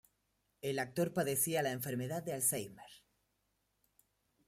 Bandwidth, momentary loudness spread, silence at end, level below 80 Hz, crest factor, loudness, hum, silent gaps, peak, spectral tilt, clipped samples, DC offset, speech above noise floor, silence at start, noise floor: 16 kHz; 10 LU; 1.5 s; -76 dBFS; 22 dB; -36 LUFS; 50 Hz at -75 dBFS; none; -18 dBFS; -4 dB/octave; under 0.1%; under 0.1%; 44 dB; 0.65 s; -81 dBFS